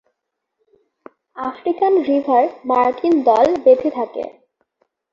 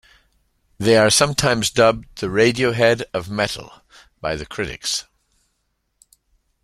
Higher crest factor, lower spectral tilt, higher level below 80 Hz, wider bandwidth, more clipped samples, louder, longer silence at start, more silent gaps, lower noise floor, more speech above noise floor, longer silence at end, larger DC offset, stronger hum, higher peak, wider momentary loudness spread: about the same, 16 dB vs 20 dB; first, -6 dB/octave vs -3.5 dB/octave; second, -60 dBFS vs -46 dBFS; second, 7.2 kHz vs 15 kHz; neither; about the same, -17 LUFS vs -18 LUFS; first, 1.35 s vs 0.8 s; neither; first, -77 dBFS vs -71 dBFS; first, 61 dB vs 52 dB; second, 0.8 s vs 1.6 s; neither; neither; about the same, -2 dBFS vs -2 dBFS; about the same, 14 LU vs 12 LU